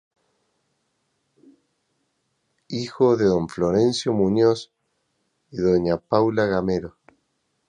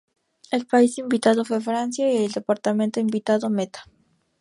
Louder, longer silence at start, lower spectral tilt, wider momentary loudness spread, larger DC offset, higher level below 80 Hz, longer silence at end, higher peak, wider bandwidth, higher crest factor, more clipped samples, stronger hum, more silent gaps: about the same, -21 LUFS vs -22 LUFS; first, 2.7 s vs 0.5 s; first, -6.5 dB/octave vs -5 dB/octave; first, 12 LU vs 8 LU; neither; first, -52 dBFS vs -70 dBFS; first, 0.8 s vs 0.55 s; about the same, -4 dBFS vs -4 dBFS; second, 10 kHz vs 11.5 kHz; about the same, 20 dB vs 18 dB; neither; neither; neither